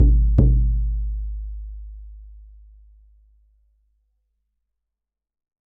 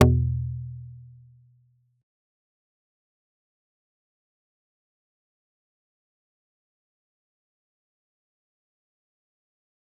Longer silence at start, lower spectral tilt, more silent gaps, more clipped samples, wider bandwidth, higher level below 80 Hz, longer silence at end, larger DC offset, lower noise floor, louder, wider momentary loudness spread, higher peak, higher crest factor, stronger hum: about the same, 0 s vs 0 s; first, -14 dB/octave vs -7 dB/octave; neither; neither; first, 1.2 kHz vs 0.6 kHz; first, -24 dBFS vs -46 dBFS; second, 3.3 s vs 8.95 s; neither; first, -85 dBFS vs -64 dBFS; first, -21 LUFS vs -26 LUFS; about the same, 25 LU vs 25 LU; about the same, 0 dBFS vs -2 dBFS; second, 22 dB vs 32 dB; neither